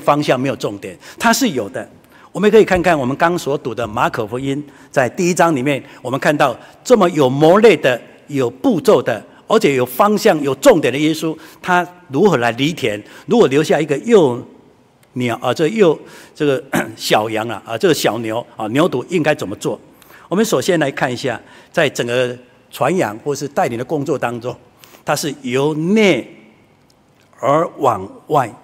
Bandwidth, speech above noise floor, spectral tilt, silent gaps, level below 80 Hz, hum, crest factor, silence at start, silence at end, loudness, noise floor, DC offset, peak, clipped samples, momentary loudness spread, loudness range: 16 kHz; 37 dB; -5 dB/octave; none; -52 dBFS; none; 16 dB; 0 s; 0.1 s; -16 LUFS; -52 dBFS; under 0.1%; 0 dBFS; under 0.1%; 12 LU; 5 LU